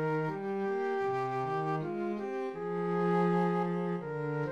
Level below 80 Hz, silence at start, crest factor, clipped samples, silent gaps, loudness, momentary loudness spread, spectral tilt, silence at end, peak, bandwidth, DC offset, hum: -72 dBFS; 0 s; 14 dB; under 0.1%; none; -33 LUFS; 7 LU; -8.5 dB/octave; 0 s; -18 dBFS; 7.6 kHz; under 0.1%; none